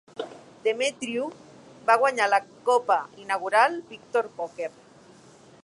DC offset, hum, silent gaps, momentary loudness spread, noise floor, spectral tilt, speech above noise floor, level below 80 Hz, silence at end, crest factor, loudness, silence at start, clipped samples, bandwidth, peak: under 0.1%; none; none; 15 LU; -52 dBFS; -2.5 dB/octave; 27 dB; -76 dBFS; 0.95 s; 20 dB; -25 LUFS; 0.15 s; under 0.1%; 11.5 kHz; -6 dBFS